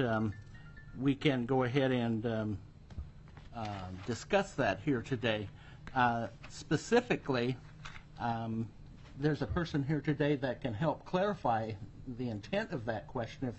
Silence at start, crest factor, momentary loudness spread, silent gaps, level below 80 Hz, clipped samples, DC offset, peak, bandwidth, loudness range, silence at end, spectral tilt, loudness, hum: 0 s; 20 dB; 18 LU; none; -56 dBFS; under 0.1%; under 0.1%; -16 dBFS; 8.2 kHz; 3 LU; 0 s; -6.5 dB/octave; -35 LUFS; none